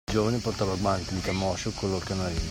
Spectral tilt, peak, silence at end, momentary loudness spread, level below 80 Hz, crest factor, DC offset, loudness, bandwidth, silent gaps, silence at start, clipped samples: -5 dB/octave; -12 dBFS; 0 s; 4 LU; -42 dBFS; 16 dB; under 0.1%; -28 LUFS; 16 kHz; none; 0.1 s; under 0.1%